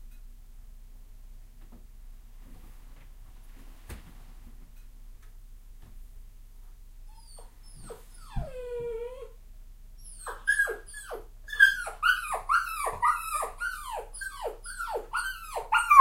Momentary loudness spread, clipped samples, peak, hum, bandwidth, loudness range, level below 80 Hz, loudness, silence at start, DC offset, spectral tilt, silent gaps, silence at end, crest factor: 26 LU; under 0.1%; -2 dBFS; none; 16 kHz; 26 LU; -46 dBFS; -29 LUFS; 0 s; under 0.1%; -1.5 dB/octave; none; 0 s; 30 dB